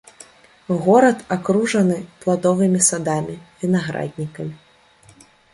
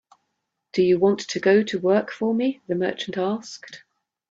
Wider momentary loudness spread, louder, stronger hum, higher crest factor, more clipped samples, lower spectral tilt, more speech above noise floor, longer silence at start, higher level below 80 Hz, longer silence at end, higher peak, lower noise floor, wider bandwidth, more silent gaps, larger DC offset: first, 15 LU vs 12 LU; first, -19 LUFS vs -22 LUFS; neither; about the same, 18 dB vs 18 dB; neither; about the same, -5 dB/octave vs -5.5 dB/octave; second, 33 dB vs 56 dB; about the same, 0.7 s vs 0.75 s; first, -58 dBFS vs -68 dBFS; first, 1 s vs 0.55 s; first, -2 dBFS vs -6 dBFS; second, -51 dBFS vs -78 dBFS; first, 11.5 kHz vs 7.8 kHz; neither; neither